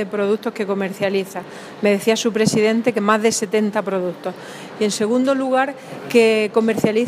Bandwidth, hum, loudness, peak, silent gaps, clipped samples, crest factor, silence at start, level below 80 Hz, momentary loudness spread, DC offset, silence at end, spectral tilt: 15.5 kHz; none; -18 LUFS; -2 dBFS; none; under 0.1%; 18 dB; 0 s; -66 dBFS; 14 LU; under 0.1%; 0 s; -4.5 dB/octave